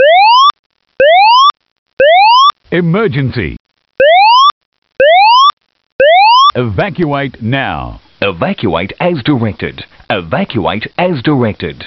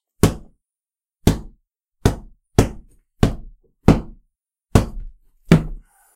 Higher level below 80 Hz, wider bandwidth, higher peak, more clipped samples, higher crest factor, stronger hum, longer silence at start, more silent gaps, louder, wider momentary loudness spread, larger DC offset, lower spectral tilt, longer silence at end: second, -40 dBFS vs -30 dBFS; second, 6.4 kHz vs 16 kHz; about the same, 0 dBFS vs 0 dBFS; neither; second, 10 dB vs 22 dB; neither; second, 0 s vs 0.25 s; first, 0.59-0.70 s, 1.71-1.86 s, 1.93-1.97 s, 3.60-3.65 s, 4.52-4.72 s, 4.78-4.82 s, 5.53-5.57 s, 5.92-5.99 s vs none; first, -9 LUFS vs -20 LUFS; second, 12 LU vs 18 LU; neither; second, -2.5 dB/octave vs -6.5 dB/octave; second, 0 s vs 0.35 s